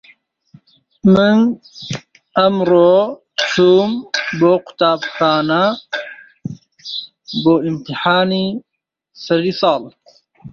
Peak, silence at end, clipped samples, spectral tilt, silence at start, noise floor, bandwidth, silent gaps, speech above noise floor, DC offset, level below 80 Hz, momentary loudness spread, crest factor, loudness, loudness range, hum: -2 dBFS; 0 s; under 0.1%; -6 dB/octave; 1.05 s; -55 dBFS; 7.4 kHz; none; 41 dB; under 0.1%; -56 dBFS; 17 LU; 14 dB; -15 LUFS; 5 LU; none